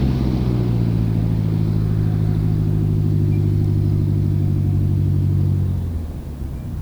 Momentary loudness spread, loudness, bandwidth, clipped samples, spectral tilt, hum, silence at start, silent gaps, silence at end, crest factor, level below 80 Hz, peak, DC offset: 7 LU; -19 LUFS; 5.8 kHz; under 0.1%; -9.5 dB/octave; none; 0 s; none; 0 s; 10 dB; -28 dBFS; -8 dBFS; under 0.1%